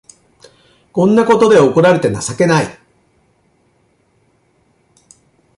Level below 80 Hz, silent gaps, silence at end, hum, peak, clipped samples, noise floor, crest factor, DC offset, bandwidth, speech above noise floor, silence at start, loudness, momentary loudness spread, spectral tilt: -52 dBFS; none; 2.85 s; none; -2 dBFS; under 0.1%; -57 dBFS; 14 dB; under 0.1%; 11.5 kHz; 47 dB; 0.95 s; -12 LUFS; 9 LU; -6 dB/octave